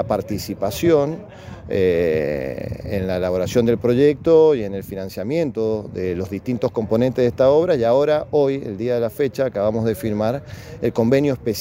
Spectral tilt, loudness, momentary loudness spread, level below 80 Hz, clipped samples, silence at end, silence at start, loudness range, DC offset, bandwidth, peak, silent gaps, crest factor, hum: -7 dB/octave; -20 LUFS; 11 LU; -46 dBFS; under 0.1%; 0 s; 0 s; 3 LU; under 0.1%; 16 kHz; -4 dBFS; none; 16 dB; none